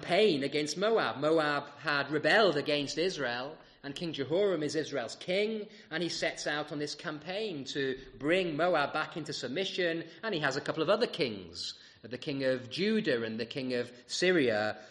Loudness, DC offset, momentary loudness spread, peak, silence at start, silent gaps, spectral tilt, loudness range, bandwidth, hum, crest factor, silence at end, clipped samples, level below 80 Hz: -32 LUFS; under 0.1%; 11 LU; -14 dBFS; 0 s; none; -4.5 dB/octave; 5 LU; 11.5 kHz; none; 18 dB; 0 s; under 0.1%; -70 dBFS